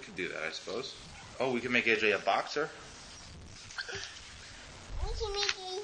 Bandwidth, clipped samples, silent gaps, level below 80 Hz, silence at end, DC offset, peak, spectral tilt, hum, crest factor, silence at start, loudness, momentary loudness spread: 10 kHz; under 0.1%; none; -48 dBFS; 0 s; under 0.1%; -10 dBFS; -3 dB/octave; none; 24 dB; 0 s; -33 LUFS; 20 LU